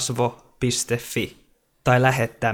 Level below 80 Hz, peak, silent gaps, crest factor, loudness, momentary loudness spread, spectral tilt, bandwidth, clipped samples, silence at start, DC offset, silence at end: -50 dBFS; -4 dBFS; none; 20 dB; -23 LUFS; 10 LU; -4.5 dB/octave; 18.5 kHz; under 0.1%; 0 s; under 0.1%; 0 s